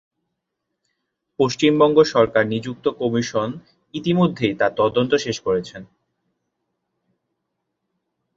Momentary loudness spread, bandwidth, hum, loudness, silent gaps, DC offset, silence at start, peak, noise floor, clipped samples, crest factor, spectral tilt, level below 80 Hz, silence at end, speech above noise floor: 11 LU; 7.8 kHz; none; -19 LUFS; none; under 0.1%; 1.4 s; -2 dBFS; -79 dBFS; under 0.1%; 20 dB; -5.5 dB/octave; -58 dBFS; 2.5 s; 60 dB